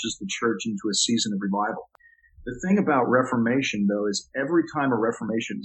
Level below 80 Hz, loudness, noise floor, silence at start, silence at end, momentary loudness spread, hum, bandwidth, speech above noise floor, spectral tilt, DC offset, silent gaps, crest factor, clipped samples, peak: -58 dBFS; -24 LUFS; -52 dBFS; 0 s; 0 s; 8 LU; none; 8.6 kHz; 27 dB; -4 dB/octave; under 0.1%; none; 18 dB; under 0.1%; -6 dBFS